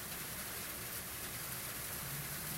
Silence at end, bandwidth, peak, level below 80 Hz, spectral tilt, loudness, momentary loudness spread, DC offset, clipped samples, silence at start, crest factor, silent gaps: 0 s; 16 kHz; -26 dBFS; -60 dBFS; -2 dB/octave; -41 LUFS; 1 LU; under 0.1%; under 0.1%; 0 s; 18 dB; none